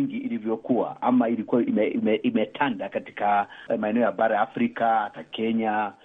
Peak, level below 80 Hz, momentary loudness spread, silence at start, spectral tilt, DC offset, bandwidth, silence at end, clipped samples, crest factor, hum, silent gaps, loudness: -8 dBFS; -72 dBFS; 7 LU; 0 s; -8.5 dB/octave; under 0.1%; 3.9 kHz; 0.1 s; under 0.1%; 16 dB; none; none; -25 LUFS